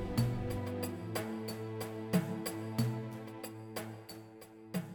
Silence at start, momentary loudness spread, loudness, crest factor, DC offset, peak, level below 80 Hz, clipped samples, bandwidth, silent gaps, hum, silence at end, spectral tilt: 0 s; 13 LU; -39 LUFS; 20 dB; under 0.1%; -18 dBFS; -56 dBFS; under 0.1%; 19 kHz; none; none; 0 s; -6 dB/octave